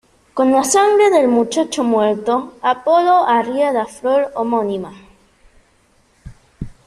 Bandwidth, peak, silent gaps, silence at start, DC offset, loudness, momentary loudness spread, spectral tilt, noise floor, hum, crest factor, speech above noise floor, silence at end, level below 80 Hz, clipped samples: 13 kHz; -2 dBFS; none; 0.35 s; under 0.1%; -15 LUFS; 11 LU; -4 dB/octave; -56 dBFS; none; 14 dB; 41 dB; 0.2 s; -48 dBFS; under 0.1%